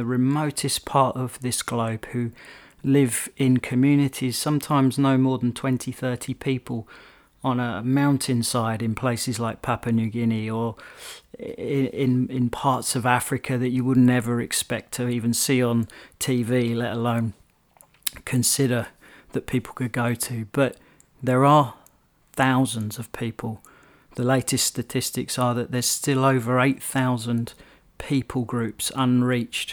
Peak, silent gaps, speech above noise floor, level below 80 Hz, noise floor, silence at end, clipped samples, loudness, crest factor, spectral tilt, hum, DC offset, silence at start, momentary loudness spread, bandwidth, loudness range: -2 dBFS; none; 36 dB; -56 dBFS; -59 dBFS; 0 s; under 0.1%; -23 LUFS; 20 dB; -5 dB/octave; none; under 0.1%; 0 s; 11 LU; over 20 kHz; 3 LU